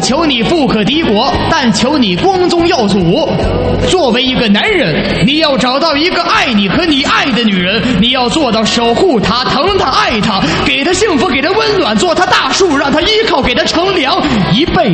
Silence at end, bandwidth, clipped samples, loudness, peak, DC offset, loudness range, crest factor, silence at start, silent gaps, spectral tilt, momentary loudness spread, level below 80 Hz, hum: 0 s; 8.8 kHz; under 0.1%; -10 LUFS; 0 dBFS; under 0.1%; 1 LU; 10 dB; 0 s; none; -4.5 dB/octave; 2 LU; -30 dBFS; none